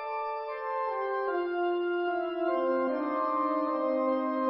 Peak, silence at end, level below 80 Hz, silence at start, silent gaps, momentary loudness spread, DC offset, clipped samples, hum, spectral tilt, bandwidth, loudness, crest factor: -18 dBFS; 0 s; -74 dBFS; 0 s; none; 6 LU; under 0.1%; under 0.1%; none; -2 dB/octave; 5.4 kHz; -30 LUFS; 12 dB